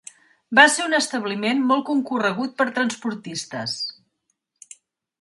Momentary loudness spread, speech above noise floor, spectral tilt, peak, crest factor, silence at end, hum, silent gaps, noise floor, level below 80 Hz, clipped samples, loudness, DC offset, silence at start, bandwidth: 14 LU; 53 dB; -2.5 dB/octave; 0 dBFS; 22 dB; 1.3 s; none; none; -74 dBFS; -74 dBFS; under 0.1%; -21 LUFS; under 0.1%; 0.5 s; 12 kHz